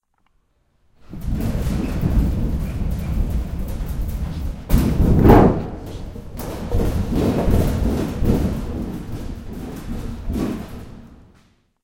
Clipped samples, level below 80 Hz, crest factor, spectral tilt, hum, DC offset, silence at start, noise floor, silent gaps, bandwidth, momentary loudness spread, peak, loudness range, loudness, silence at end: under 0.1%; -24 dBFS; 20 dB; -8 dB/octave; none; under 0.1%; 1.1 s; -63 dBFS; none; 17 kHz; 15 LU; 0 dBFS; 8 LU; -21 LUFS; 0.7 s